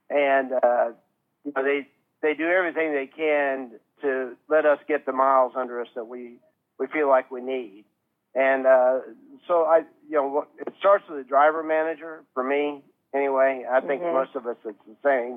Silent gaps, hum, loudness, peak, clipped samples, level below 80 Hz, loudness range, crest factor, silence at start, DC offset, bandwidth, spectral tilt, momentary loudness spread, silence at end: none; none; -24 LUFS; -6 dBFS; under 0.1%; under -90 dBFS; 3 LU; 18 dB; 0.1 s; under 0.1%; 3.8 kHz; -7 dB/octave; 14 LU; 0 s